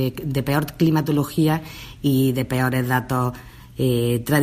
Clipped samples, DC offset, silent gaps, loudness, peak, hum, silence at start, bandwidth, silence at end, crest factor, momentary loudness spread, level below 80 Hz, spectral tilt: under 0.1%; under 0.1%; none; -21 LUFS; -6 dBFS; none; 0 s; 15.5 kHz; 0 s; 16 dB; 7 LU; -46 dBFS; -6.5 dB/octave